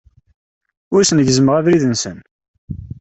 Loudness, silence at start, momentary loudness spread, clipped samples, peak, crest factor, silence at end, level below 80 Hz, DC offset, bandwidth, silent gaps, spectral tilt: -14 LUFS; 0.9 s; 19 LU; under 0.1%; -2 dBFS; 14 dB; 0.15 s; -46 dBFS; under 0.1%; 8.4 kHz; 2.31-2.39 s, 2.48-2.68 s; -5 dB/octave